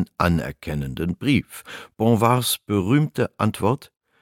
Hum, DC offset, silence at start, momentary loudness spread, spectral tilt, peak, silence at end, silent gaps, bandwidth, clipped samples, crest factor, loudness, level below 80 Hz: none; under 0.1%; 0 s; 10 LU; -5.5 dB/octave; -2 dBFS; 0.35 s; none; 17 kHz; under 0.1%; 20 dB; -22 LUFS; -44 dBFS